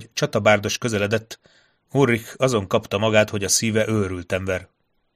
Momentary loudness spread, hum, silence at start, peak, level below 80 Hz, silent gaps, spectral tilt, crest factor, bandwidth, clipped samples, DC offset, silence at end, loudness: 8 LU; none; 0 s; 0 dBFS; -54 dBFS; none; -4 dB/octave; 22 dB; 15.5 kHz; under 0.1%; under 0.1%; 0.5 s; -21 LUFS